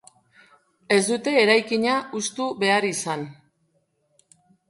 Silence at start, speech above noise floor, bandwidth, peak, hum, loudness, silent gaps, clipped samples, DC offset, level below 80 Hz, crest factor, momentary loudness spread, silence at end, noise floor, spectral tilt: 0.9 s; 47 dB; 11.5 kHz; -2 dBFS; none; -22 LUFS; none; under 0.1%; under 0.1%; -72 dBFS; 22 dB; 11 LU; 1.35 s; -69 dBFS; -3 dB/octave